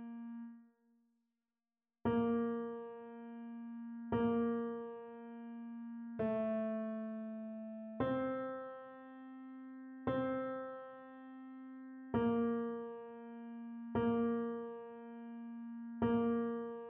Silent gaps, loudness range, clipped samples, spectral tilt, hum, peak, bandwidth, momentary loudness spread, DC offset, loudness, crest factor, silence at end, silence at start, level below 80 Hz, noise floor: none; 4 LU; under 0.1%; -7 dB/octave; none; -24 dBFS; 3.7 kHz; 17 LU; under 0.1%; -40 LUFS; 18 dB; 0 s; 0 s; -70 dBFS; under -90 dBFS